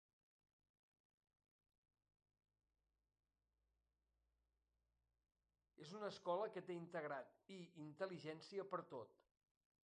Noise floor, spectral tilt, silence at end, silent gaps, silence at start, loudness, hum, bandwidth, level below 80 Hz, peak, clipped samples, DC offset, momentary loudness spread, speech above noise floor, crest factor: under -90 dBFS; -6 dB/octave; 0.75 s; none; 5.8 s; -51 LUFS; none; 9.4 kHz; under -90 dBFS; -32 dBFS; under 0.1%; under 0.1%; 14 LU; over 39 dB; 22 dB